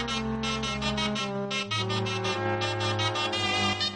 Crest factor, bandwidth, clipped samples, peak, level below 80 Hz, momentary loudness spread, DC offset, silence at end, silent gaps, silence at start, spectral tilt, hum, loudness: 14 dB; 10 kHz; under 0.1%; -14 dBFS; -48 dBFS; 4 LU; under 0.1%; 0 s; none; 0 s; -4 dB/octave; none; -28 LUFS